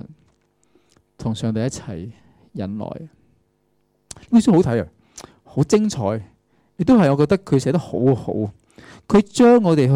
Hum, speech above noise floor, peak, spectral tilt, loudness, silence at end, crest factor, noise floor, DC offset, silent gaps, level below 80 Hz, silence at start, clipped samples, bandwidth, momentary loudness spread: none; 48 dB; -6 dBFS; -7 dB/octave; -18 LUFS; 0 s; 14 dB; -65 dBFS; under 0.1%; none; -50 dBFS; 0.05 s; under 0.1%; 11.5 kHz; 19 LU